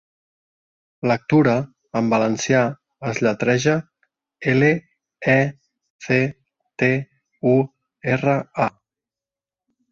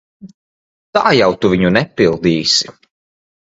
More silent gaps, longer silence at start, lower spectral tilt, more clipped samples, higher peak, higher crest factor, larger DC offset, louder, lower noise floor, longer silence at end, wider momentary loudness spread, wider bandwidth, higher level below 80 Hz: second, 5.90-5.99 s vs 0.34-0.93 s; first, 1.05 s vs 0.25 s; first, -6.5 dB/octave vs -4.5 dB/octave; neither; second, -4 dBFS vs 0 dBFS; about the same, 18 dB vs 16 dB; neither; second, -20 LUFS vs -13 LUFS; about the same, under -90 dBFS vs under -90 dBFS; first, 1.2 s vs 0.75 s; first, 10 LU vs 4 LU; about the same, 7.6 kHz vs 8 kHz; second, -58 dBFS vs -44 dBFS